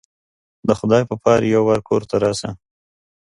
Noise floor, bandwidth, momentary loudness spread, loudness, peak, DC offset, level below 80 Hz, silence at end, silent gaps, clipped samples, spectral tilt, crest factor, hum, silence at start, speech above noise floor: under -90 dBFS; 11.5 kHz; 10 LU; -18 LUFS; 0 dBFS; under 0.1%; -50 dBFS; 0.7 s; none; under 0.1%; -6 dB/octave; 18 dB; none; 0.65 s; over 73 dB